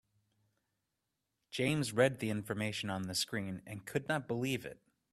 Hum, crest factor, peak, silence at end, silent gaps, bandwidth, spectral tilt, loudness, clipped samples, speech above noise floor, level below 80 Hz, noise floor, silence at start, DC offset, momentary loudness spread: none; 22 dB; -16 dBFS; 0.4 s; none; 15 kHz; -4.5 dB/octave; -36 LUFS; under 0.1%; 50 dB; -70 dBFS; -86 dBFS; 1.5 s; under 0.1%; 11 LU